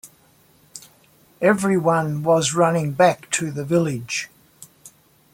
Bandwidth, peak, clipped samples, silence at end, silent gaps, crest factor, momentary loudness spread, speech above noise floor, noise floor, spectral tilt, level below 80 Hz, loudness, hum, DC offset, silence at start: 17 kHz; -4 dBFS; under 0.1%; 0.45 s; none; 18 dB; 22 LU; 37 dB; -56 dBFS; -5 dB/octave; -62 dBFS; -20 LUFS; none; under 0.1%; 0.05 s